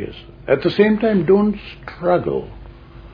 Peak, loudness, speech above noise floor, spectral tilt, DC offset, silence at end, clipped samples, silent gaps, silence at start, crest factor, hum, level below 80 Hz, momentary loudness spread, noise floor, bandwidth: 0 dBFS; -17 LUFS; 21 dB; -9.5 dB/octave; under 0.1%; 0.05 s; under 0.1%; none; 0 s; 18 dB; none; -42 dBFS; 19 LU; -38 dBFS; 5.2 kHz